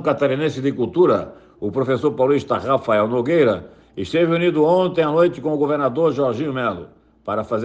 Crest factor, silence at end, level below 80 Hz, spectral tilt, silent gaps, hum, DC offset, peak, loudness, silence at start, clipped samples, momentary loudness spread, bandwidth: 14 dB; 0 s; -56 dBFS; -7.5 dB/octave; none; none; under 0.1%; -4 dBFS; -19 LUFS; 0 s; under 0.1%; 10 LU; 8.2 kHz